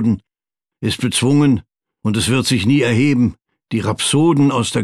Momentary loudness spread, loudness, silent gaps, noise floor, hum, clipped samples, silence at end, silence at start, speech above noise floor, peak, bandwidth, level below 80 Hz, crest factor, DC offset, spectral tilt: 9 LU; -16 LUFS; none; -87 dBFS; none; under 0.1%; 0 s; 0 s; 72 dB; -6 dBFS; 13.5 kHz; -46 dBFS; 12 dB; under 0.1%; -5 dB/octave